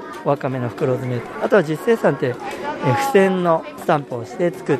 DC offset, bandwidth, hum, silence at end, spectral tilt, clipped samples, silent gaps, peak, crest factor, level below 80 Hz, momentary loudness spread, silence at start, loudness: under 0.1%; 13.5 kHz; none; 0 s; -6.5 dB/octave; under 0.1%; none; -2 dBFS; 16 dB; -60 dBFS; 9 LU; 0 s; -20 LUFS